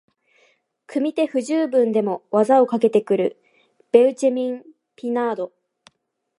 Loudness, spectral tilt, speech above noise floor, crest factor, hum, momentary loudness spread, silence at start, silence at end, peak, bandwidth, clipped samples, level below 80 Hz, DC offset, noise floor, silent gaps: -20 LUFS; -6 dB/octave; 53 dB; 20 dB; none; 12 LU; 0.9 s; 0.9 s; -2 dBFS; 11.5 kHz; under 0.1%; -80 dBFS; under 0.1%; -72 dBFS; none